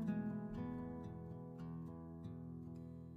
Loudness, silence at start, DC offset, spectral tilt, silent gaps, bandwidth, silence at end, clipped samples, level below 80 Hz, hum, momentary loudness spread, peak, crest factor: -49 LUFS; 0 s; under 0.1%; -10 dB/octave; none; 6.2 kHz; 0 s; under 0.1%; -64 dBFS; none; 8 LU; -32 dBFS; 16 dB